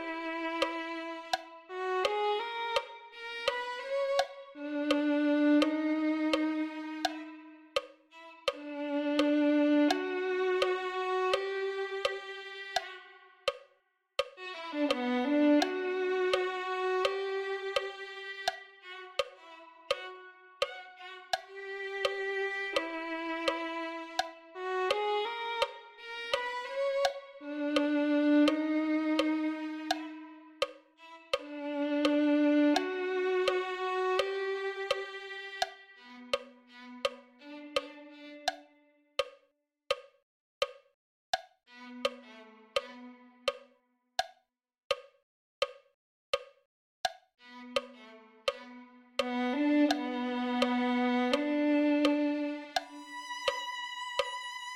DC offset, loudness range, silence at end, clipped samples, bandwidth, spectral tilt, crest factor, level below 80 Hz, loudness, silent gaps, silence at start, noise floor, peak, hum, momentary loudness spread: under 0.1%; 10 LU; 0 s; under 0.1%; 13.5 kHz; -2.5 dB/octave; 20 dB; -72 dBFS; -33 LUFS; 40.23-40.61 s, 40.94-41.33 s, 44.84-44.90 s, 45.23-45.62 s, 45.94-46.33 s, 46.65-47.04 s; 0 s; -75 dBFS; -12 dBFS; none; 18 LU